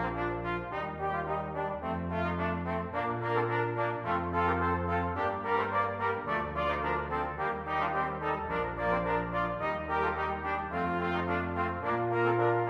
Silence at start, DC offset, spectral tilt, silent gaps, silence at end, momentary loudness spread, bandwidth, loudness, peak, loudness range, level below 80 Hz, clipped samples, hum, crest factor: 0 s; under 0.1%; -8 dB/octave; none; 0 s; 5 LU; 7.2 kHz; -32 LUFS; -14 dBFS; 2 LU; -50 dBFS; under 0.1%; none; 16 dB